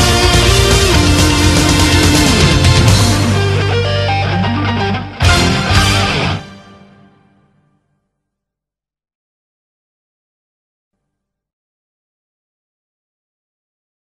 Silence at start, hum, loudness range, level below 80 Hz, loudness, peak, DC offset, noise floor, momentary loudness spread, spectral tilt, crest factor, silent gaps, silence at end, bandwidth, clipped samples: 0 s; none; 9 LU; -24 dBFS; -11 LUFS; 0 dBFS; under 0.1%; -86 dBFS; 6 LU; -4 dB/octave; 14 dB; none; 7.45 s; 14 kHz; under 0.1%